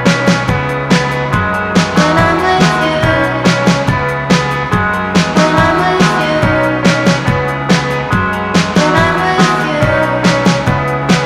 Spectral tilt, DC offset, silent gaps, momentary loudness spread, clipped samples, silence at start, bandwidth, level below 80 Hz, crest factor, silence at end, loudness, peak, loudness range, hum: -5.5 dB/octave; under 0.1%; none; 4 LU; under 0.1%; 0 s; 14 kHz; -32 dBFS; 12 dB; 0 s; -12 LUFS; 0 dBFS; 1 LU; none